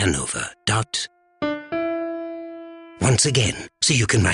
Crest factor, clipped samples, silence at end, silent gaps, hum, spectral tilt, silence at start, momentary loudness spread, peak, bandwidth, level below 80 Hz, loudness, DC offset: 16 dB; under 0.1%; 0 s; none; none; -3.5 dB/octave; 0 s; 16 LU; -6 dBFS; 11 kHz; -44 dBFS; -22 LUFS; under 0.1%